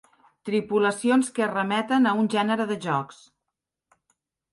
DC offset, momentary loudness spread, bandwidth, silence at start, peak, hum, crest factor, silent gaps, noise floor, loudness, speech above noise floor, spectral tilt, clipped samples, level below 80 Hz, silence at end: under 0.1%; 7 LU; 11.5 kHz; 0.45 s; -8 dBFS; none; 16 dB; none; -84 dBFS; -24 LUFS; 61 dB; -5 dB/octave; under 0.1%; -72 dBFS; 1.4 s